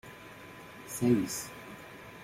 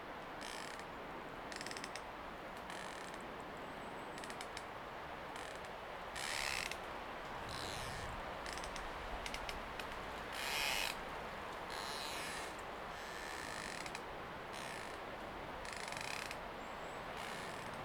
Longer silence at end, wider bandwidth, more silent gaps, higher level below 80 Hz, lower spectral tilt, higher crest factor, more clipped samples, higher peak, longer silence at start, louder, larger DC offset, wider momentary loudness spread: about the same, 0 s vs 0 s; second, 16.5 kHz vs over 20 kHz; neither; about the same, -64 dBFS vs -60 dBFS; first, -5 dB/octave vs -2.5 dB/octave; about the same, 20 dB vs 22 dB; neither; first, -14 dBFS vs -24 dBFS; about the same, 0.05 s vs 0 s; first, -32 LUFS vs -45 LUFS; neither; first, 20 LU vs 8 LU